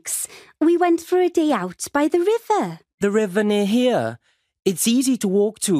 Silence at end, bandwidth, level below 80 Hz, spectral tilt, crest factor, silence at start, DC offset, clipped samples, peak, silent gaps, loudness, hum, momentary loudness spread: 0 s; 15.5 kHz; -64 dBFS; -4.5 dB/octave; 14 dB; 0.05 s; under 0.1%; under 0.1%; -6 dBFS; 2.94-2.98 s; -20 LUFS; none; 7 LU